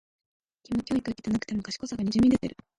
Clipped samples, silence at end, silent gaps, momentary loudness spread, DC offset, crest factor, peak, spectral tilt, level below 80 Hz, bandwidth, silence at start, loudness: under 0.1%; 0.3 s; none; 10 LU; under 0.1%; 16 dB; -12 dBFS; -6 dB/octave; -52 dBFS; 11 kHz; 0.7 s; -28 LUFS